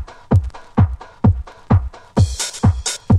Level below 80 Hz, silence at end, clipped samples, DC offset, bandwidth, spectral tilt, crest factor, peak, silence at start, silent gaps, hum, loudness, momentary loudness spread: -28 dBFS; 0 s; under 0.1%; under 0.1%; 12.5 kHz; -6 dB/octave; 16 dB; -2 dBFS; 0 s; none; none; -19 LUFS; 5 LU